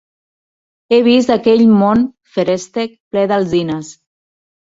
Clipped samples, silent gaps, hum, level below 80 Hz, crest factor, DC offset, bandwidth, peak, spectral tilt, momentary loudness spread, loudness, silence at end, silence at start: under 0.1%; 3.00-3.11 s; none; -52 dBFS; 14 dB; under 0.1%; 7.8 kHz; -2 dBFS; -6 dB/octave; 12 LU; -14 LUFS; 0.8 s; 0.9 s